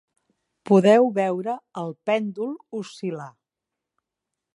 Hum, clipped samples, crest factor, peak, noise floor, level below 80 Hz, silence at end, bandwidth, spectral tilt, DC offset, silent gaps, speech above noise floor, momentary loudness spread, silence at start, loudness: none; under 0.1%; 20 dB; -4 dBFS; -86 dBFS; -78 dBFS; 1.25 s; 11.5 kHz; -7 dB/octave; under 0.1%; none; 64 dB; 17 LU; 0.65 s; -22 LUFS